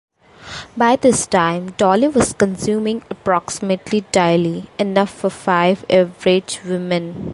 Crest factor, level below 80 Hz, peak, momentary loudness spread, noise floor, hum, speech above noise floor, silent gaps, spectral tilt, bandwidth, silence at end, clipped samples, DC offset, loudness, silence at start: 16 dB; -48 dBFS; -2 dBFS; 8 LU; -36 dBFS; none; 19 dB; none; -5 dB/octave; 11.5 kHz; 0 s; under 0.1%; under 0.1%; -17 LUFS; 0.4 s